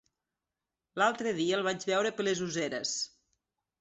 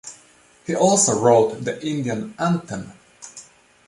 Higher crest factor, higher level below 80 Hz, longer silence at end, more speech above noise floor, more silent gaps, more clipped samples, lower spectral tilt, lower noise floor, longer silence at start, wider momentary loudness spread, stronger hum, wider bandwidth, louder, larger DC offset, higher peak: about the same, 20 dB vs 20 dB; second, -74 dBFS vs -60 dBFS; first, 0.75 s vs 0.45 s; first, 59 dB vs 33 dB; neither; neither; second, -3 dB/octave vs -4.5 dB/octave; first, -89 dBFS vs -53 dBFS; first, 0.95 s vs 0.05 s; second, 6 LU vs 24 LU; neither; second, 8.4 kHz vs 11.5 kHz; second, -31 LUFS vs -19 LUFS; neither; second, -14 dBFS vs -2 dBFS